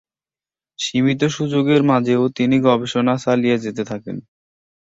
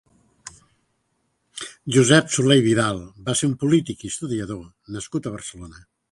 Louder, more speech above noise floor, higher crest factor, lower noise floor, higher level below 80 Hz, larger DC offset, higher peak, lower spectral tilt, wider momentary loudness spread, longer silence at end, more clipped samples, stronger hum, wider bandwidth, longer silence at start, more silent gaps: about the same, -18 LUFS vs -20 LUFS; first, over 73 dB vs 50 dB; second, 16 dB vs 22 dB; first, under -90 dBFS vs -71 dBFS; about the same, -58 dBFS vs -54 dBFS; neither; about the same, -2 dBFS vs 0 dBFS; first, -6 dB/octave vs -4.5 dB/octave; second, 11 LU vs 24 LU; first, 0.65 s vs 0.4 s; neither; neither; second, 7.8 kHz vs 11.5 kHz; first, 0.8 s vs 0.45 s; neither